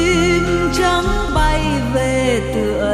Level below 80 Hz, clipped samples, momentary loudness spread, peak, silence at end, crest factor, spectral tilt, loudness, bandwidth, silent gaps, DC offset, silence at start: -24 dBFS; under 0.1%; 3 LU; -4 dBFS; 0 s; 12 dB; -5 dB/octave; -16 LUFS; 14 kHz; none; under 0.1%; 0 s